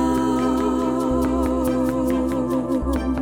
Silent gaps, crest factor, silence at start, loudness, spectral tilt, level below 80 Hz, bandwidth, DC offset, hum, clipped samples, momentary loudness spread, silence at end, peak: none; 12 dB; 0 s; -21 LUFS; -7 dB/octave; -32 dBFS; 17.5 kHz; under 0.1%; none; under 0.1%; 2 LU; 0 s; -8 dBFS